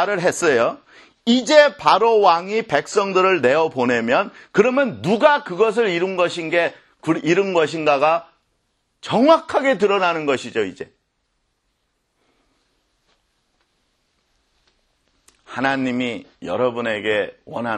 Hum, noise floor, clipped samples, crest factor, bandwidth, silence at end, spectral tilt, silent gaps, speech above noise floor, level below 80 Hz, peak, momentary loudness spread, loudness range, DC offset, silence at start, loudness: none; -70 dBFS; under 0.1%; 20 dB; 12 kHz; 0 s; -4.5 dB/octave; none; 52 dB; -64 dBFS; 0 dBFS; 11 LU; 11 LU; under 0.1%; 0 s; -18 LUFS